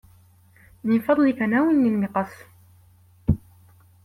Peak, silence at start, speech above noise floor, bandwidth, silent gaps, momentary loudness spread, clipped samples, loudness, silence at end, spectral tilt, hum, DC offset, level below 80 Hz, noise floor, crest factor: -6 dBFS; 0.85 s; 34 dB; 15.5 kHz; none; 11 LU; under 0.1%; -22 LUFS; 0.65 s; -9 dB/octave; none; under 0.1%; -46 dBFS; -54 dBFS; 18 dB